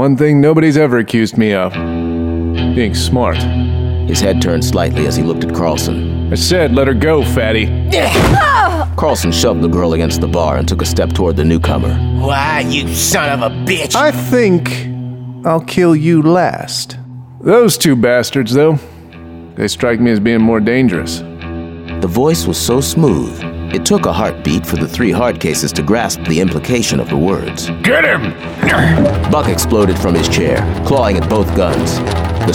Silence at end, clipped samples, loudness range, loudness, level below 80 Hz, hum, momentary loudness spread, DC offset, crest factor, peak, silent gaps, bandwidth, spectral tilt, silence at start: 0 s; under 0.1%; 3 LU; -13 LUFS; -26 dBFS; none; 9 LU; under 0.1%; 12 dB; 0 dBFS; none; 18 kHz; -5.5 dB/octave; 0 s